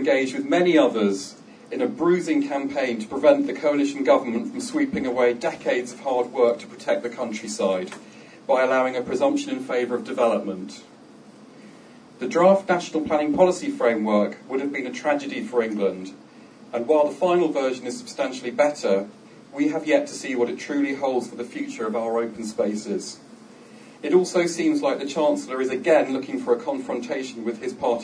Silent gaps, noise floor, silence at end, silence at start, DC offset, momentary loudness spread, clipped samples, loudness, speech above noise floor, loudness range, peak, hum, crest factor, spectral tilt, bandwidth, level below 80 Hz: none; -47 dBFS; 0 s; 0 s; under 0.1%; 11 LU; under 0.1%; -23 LUFS; 24 dB; 4 LU; -4 dBFS; none; 18 dB; -5 dB/octave; 10.5 kHz; -68 dBFS